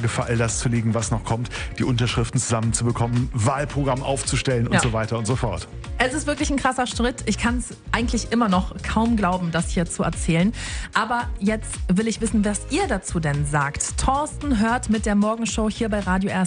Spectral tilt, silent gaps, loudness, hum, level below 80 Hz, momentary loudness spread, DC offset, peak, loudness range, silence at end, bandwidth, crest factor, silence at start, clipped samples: -5 dB/octave; none; -23 LUFS; none; -34 dBFS; 4 LU; under 0.1%; -4 dBFS; 1 LU; 0 s; 10 kHz; 18 dB; 0 s; under 0.1%